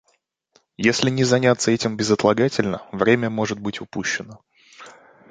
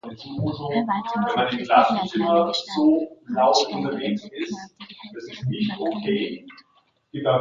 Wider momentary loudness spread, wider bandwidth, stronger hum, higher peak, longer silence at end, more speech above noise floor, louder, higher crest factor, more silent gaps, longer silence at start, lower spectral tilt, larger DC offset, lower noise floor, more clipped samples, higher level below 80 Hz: second, 10 LU vs 17 LU; first, 9.6 kHz vs 7.6 kHz; neither; about the same, -2 dBFS vs -2 dBFS; first, 0.4 s vs 0 s; first, 47 dB vs 41 dB; first, -20 LUFS vs -23 LUFS; about the same, 20 dB vs 22 dB; neither; first, 0.8 s vs 0.05 s; about the same, -4.5 dB/octave vs -5.5 dB/octave; neither; about the same, -67 dBFS vs -64 dBFS; neither; first, -56 dBFS vs -62 dBFS